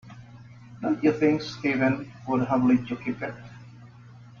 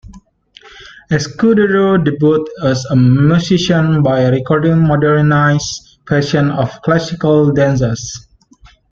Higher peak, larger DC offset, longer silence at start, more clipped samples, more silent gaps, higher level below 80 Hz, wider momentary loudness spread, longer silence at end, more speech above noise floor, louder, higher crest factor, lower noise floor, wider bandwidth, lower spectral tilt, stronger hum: second, -10 dBFS vs -2 dBFS; neither; about the same, 0.05 s vs 0.1 s; neither; neither; second, -60 dBFS vs -42 dBFS; first, 23 LU vs 7 LU; second, 0.05 s vs 0.75 s; second, 23 dB vs 34 dB; second, -26 LUFS vs -13 LUFS; first, 18 dB vs 12 dB; about the same, -48 dBFS vs -45 dBFS; about the same, 7 kHz vs 7.6 kHz; about the same, -7.5 dB/octave vs -6.5 dB/octave; first, 60 Hz at -40 dBFS vs none